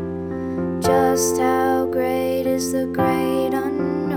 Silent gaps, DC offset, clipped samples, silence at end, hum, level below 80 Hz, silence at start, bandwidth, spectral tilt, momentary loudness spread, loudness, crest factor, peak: none; under 0.1%; under 0.1%; 0 s; none; -48 dBFS; 0 s; over 20 kHz; -5 dB/octave; 7 LU; -20 LUFS; 14 dB; -6 dBFS